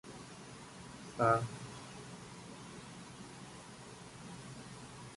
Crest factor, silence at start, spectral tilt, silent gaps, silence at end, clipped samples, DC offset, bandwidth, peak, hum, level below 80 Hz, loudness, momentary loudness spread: 24 dB; 0.05 s; -5 dB/octave; none; 0 s; under 0.1%; under 0.1%; 11.5 kHz; -18 dBFS; none; -68 dBFS; -42 LUFS; 19 LU